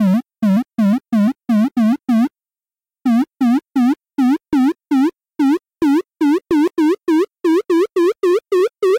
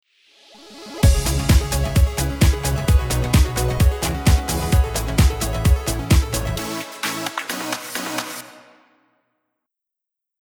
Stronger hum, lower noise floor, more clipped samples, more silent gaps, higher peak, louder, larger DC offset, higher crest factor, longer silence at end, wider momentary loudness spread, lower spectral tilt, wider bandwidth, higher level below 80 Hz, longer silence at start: neither; first, under -90 dBFS vs -84 dBFS; neither; neither; second, -10 dBFS vs -2 dBFS; first, -17 LUFS vs -20 LUFS; neither; second, 6 dB vs 18 dB; second, 0 s vs 1.9 s; second, 2 LU vs 8 LU; first, -7.5 dB/octave vs -5 dB/octave; second, 16.5 kHz vs over 20 kHz; second, -58 dBFS vs -22 dBFS; second, 0 s vs 0.65 s